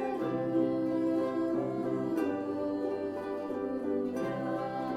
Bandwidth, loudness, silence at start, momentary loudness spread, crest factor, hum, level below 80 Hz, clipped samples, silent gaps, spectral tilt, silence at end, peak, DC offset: 12.5 kHz; -33 LUFS; 0 s; 5 LU; 14 dB; none; -70 dBFS; under 0.1%; none; -8 dB/octave; 0 s; -18 dBFS; under 0.1%